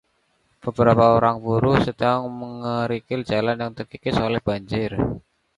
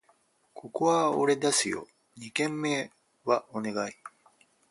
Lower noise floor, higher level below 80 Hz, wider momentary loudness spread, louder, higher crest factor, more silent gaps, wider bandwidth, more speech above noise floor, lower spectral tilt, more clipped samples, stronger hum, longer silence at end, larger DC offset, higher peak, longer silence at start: about the same, -66 dBFS vs -67 dBFS; first, -44 dBFS vs -74 dBFS; second, 14 LU vs 19 LU; first, -22 LUFS vs -29 LUFS; about the same, 20 dB vs 20 dB; neither; about the same, 11 kHz vs 11.5 kHz; first, 45 dB vs 39 dB; first, -8 dB/octave vs -3.5 dB/octave; neither; neither; second, 0.4 s vs 0.6 s; neither; first, -2 dBFS vs -10 dBFS; about the same, 0.65 s vs 0.55 s